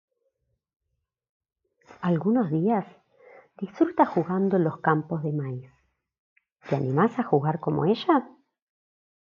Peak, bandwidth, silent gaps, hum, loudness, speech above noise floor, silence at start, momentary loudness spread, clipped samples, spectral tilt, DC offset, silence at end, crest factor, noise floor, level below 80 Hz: -6 dBFS; 7 kHz; 6.19-6.36 s; none; -25 LUFS; 56 dB; 2 s; 9 LU; under 0.1%; -9.5 dB/octave; under 0.1%; 1.05 s; 20 dB; -81 dBFS; -70 dBFS